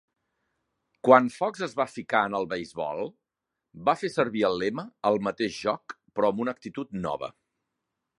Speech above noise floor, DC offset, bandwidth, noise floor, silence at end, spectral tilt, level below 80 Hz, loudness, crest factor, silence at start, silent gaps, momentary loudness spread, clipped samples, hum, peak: 60 dB; under 0.1%; 11.5 kHz; -86 dBFS; 0.9 s; -5.5 dB/octave; -66 dBFS; -27 LUFS; 26 dB; 1.05 s; none; 15 LU; under 0.1%; none; -2 dBFS